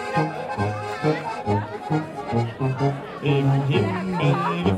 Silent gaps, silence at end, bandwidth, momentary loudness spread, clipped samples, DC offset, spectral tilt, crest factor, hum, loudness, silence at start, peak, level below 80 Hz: none; 0 s; 10.5 kHz; 6 LU; under 0.1%; under 0.1%; -7.5 dB/octave; 16 dB; none; -24 LUFS; 0 s; -8 dBFS; -52 dBFS